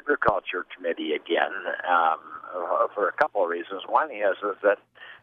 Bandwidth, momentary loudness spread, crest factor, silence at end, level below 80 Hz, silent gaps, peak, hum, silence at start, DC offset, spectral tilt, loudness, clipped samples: 6 kHz; 9 LU; 20 dB; 0.05 s; -62 dBFS; none; -6 dBFS; none; 0.05 s; under 0.1%; -6 dB/octave; -26 LUFS; under 0.1%